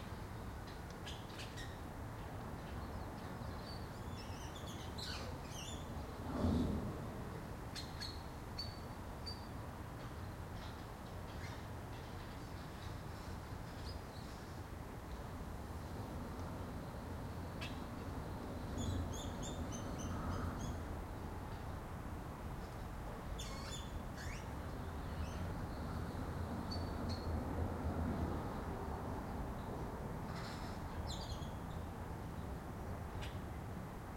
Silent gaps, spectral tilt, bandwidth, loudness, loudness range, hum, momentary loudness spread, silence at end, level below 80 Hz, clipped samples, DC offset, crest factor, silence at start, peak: none; -5.5 dB/octave; 16.5 kHz; -46 LUFS; 6 LU; none; 7 LU; 0 s; -52 dBFS; under 0.1%; under 0.1%; 20 dB; 0 s; -24 dBFS